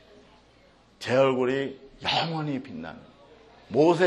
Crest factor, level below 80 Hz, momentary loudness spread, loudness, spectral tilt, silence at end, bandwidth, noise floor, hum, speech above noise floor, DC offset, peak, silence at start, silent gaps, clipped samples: 18 dB; -64 dBFS; 17 LU; -26 LUFS; -6 dB/octave; 0 s; 11.5 kHz; -58 dBFS; none; 33 dB; under 0.1%; -8 dBFS; 1 s; none; under 0.1%